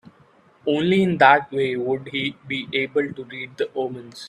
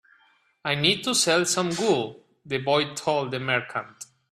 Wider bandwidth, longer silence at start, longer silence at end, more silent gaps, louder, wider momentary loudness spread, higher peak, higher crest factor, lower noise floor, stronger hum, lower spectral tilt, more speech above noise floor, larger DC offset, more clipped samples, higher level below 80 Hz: second, 11.5 kHz vs 15.5 kHz; about the same, 0.65 s vs 0.65 s; second, 0 s vs 0.25 s; neither; first, -21 LUFS vs -24 LUFS; about the same, 14 LU vs 13 LU; first, 0 dBFS vs -6 dBFS; about the same, 22 dB vs 20 dB; second, -55 dBFS vs -63 dBFS; neither; first, -6.5 dB/octave vs -3 dB/octave; second, 34 dB vs 38 dB; neither; neither; about the same, -64 dBFS vs -66 dBFS